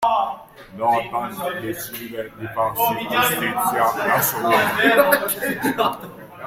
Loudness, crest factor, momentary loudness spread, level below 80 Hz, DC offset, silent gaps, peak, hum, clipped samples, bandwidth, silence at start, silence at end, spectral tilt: -20 LUFS; 20 dB; 14 LU; -56 dBFS; under 0.1%; none; -2 dBFS; none; under 0.1%; 16.5 kHz; 0 s; 0 s; -3.5 dB/octave